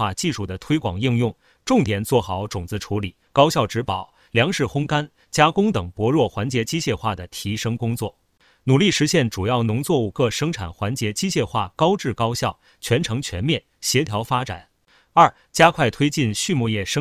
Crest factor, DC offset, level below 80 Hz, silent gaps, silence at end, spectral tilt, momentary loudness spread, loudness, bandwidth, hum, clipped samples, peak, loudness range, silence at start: 20 dB; under 0.1%; -44 dBFS; none; 0 s; -5 dB/octave; 10 LU; -21 LUFS; 16 kHz; none; under 0.1%; 0 dBFS; 3 LU; 0 s